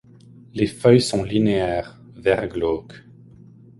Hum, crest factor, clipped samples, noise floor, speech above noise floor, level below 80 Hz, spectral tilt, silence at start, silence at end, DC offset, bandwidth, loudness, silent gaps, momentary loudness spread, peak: none; 20 dB; under 0.1%; -47 dBFS; 27 dB; -46 dBFS; -6 dB/octave; 0.55 s; 0.8 s; under 0.1%; 11.5 kHz; -21 LUFS; none; 13 LU; -2 dBFS